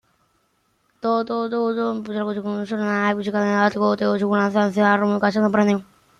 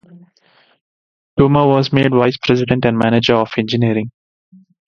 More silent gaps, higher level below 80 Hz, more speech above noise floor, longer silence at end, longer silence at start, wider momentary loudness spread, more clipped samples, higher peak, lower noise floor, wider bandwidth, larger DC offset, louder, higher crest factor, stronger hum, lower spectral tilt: second, none vs 0.81-1.37 s; second, -66 dBFS vs -44 dBFS; first, 46 dB vs 41 dB; second, 0.35 s vs 0.85 s; first, 1.05 s vs 0.15 s; first, 8 LU vs 5 LU; neither; second, -4 dBFS vs 0 dBFS; first, -66 dBFS vs -55 dBFS; about the same, 7.2 kHz vs 7 kHz; neither; second, -21 LUFS vs -14 LUFS; about the same, 18 dB vs 16 dB; neither; about the same, -7 dB/octave vs -7.5 dB/octave